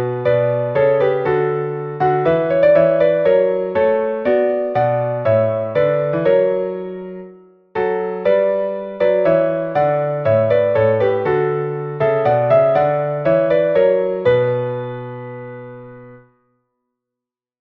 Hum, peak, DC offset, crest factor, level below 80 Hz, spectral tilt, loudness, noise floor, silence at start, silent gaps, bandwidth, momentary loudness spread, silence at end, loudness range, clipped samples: none; -2 dBFS; under 0.1%; 14 dB; -54 dBFS; -9.5 dB/octave; -16 LUFS; -85 dBFS; 0 s; none; 4.8 kHz; 12 LU; 1.45 s; 4 LU; under 0.1%